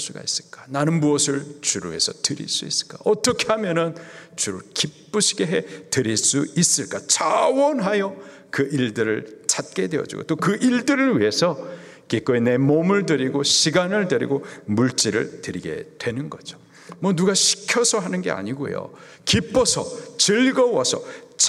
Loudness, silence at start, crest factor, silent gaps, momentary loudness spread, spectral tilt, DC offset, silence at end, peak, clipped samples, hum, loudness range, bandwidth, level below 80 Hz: -21 LUFS; 0 s; 20 dB; none; 12 LU; -3.5 dB/octave; under 0.1%; 0 s; -2 dBFS; under 0.1%; none; 3 LU; 14 kHz; -58 dBFS